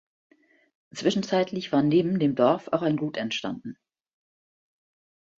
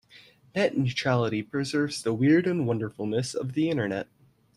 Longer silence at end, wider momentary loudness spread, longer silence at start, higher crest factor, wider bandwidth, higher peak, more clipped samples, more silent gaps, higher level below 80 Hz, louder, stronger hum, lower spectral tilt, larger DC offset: first, 1.65 s vs 0.55 s; first, 13 LU vs 8 LU; first, 0.95 s vs 0.15 s; about the same, 20 dB vs 18 dB; second, 7.8 kHz vs 12.5 kHz; about the same, -8 dBFS vs -10 dBFS; neither; neither; about the same, -68 dBFS vs -64 dBFS; about the same, -25 LUFS vs -27 LUFS; neither; about the same, -6 dB/octave vs -6 dB/octave; neither